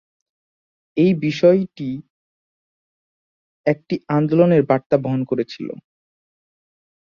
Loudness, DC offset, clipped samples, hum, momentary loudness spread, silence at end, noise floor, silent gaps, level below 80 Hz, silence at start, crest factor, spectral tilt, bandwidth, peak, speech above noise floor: -19 LUFS; under 0.1%; under 0.1%; none; 15 LU; 1.35 s; under -90 dBFS; 2.10-3.64 s, 4.86-4.90 s; -62 dBFS; 0.95 s; 18 dB; -8.5 dB/octave; 7 kHz; -2 dBFS; over 72 dB